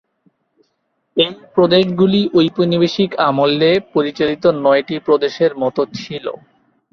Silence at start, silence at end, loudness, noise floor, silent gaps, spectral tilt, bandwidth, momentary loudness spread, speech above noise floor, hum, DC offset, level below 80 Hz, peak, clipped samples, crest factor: 1.15 s; 0.55 s; -15 LUFS; -68 dBFS; none; -7 dB/octave; 6.8 kHz; 10 LU; 53 dB; none; under 0.1%; -56 dBFS; -2 dBFS; under 0.1%; 14 dB